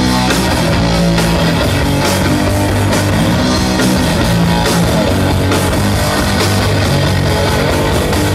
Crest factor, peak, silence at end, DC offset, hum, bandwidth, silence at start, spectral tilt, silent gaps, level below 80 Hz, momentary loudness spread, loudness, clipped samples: 10 dB; -2 dBFS; 0 s; under 0.1%; none; 16 kHz; 0 s; -5 dB/octave; none; -24 dBFS; 1 LU; -12 LUFS; under 0.1%